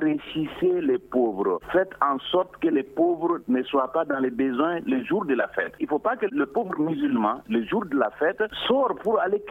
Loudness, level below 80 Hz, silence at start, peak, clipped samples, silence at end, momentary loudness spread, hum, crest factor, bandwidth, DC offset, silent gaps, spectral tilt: -25 LUFS; -60 dBFS; 0 s; -6 dBFS; under 0.1%; 0 s; 4 LU; none; 18 dB; 4 kHz; under 0.1%; none; -7.5 dB/octave